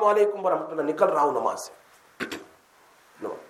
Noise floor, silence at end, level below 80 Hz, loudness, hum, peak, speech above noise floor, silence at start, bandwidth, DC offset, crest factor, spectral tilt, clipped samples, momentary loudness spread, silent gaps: -57 dBFS; 0.05 s; -76 dBFS; -25 LUFS; none; -6 dBFS; 34 dB; 0 s; 14.5 kHz; under 0.1%; 20 dB; -4.5 dB/octave; under 0.1%; 16 LU; none